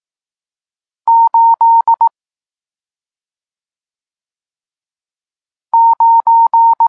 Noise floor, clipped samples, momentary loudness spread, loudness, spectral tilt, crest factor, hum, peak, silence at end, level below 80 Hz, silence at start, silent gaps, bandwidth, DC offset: under -90 dBFS; under 0.1%; 6 LU; -10 LUFS; -2.5 dB/octave; 10 dB; none; -4 dBFS; 0 s; -82 dBFS; 1.05 s; none; 1.7 kHz; under 0.1%